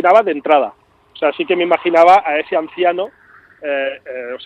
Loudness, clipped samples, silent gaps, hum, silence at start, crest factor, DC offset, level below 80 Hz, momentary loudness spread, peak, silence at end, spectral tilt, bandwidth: -15 LUFS; under 0.1%; none; none; 0 s; 16 dB; under 0.1%; -64 dBFS; 16 LU; 0 dBFS; 0 s; -5 dB/octave; 8.4 kHz